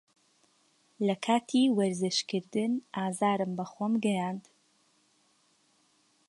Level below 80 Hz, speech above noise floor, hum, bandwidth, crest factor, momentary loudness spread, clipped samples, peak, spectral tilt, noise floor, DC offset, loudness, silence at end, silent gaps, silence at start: -82 dBFS; 40 dB; none; 11.5 kHz; 18 dB; 8 LU; under 0.1%; -14 dBFS; -5 dB/octave; -69 dBFS; under 0.1%; -30 LUFS; 1.9 s; none; 1 s